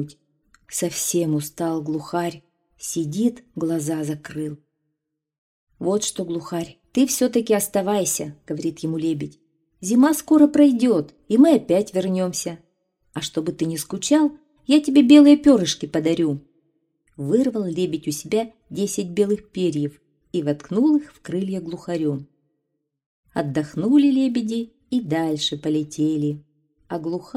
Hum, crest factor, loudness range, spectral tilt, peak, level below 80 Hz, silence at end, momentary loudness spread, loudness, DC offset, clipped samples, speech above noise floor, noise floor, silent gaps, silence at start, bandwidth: none; 20 dB; 9 LU; -5 dB/octave; -2 dBFS; -60 dBFS; 0.15 s; 14 LU; -21 LUFS; under 0.1%; under 0.1%; 59 dB; -79 dBFS; 5.38-5.67 s, 23.06-23.23 s; 0 s; 16 kHz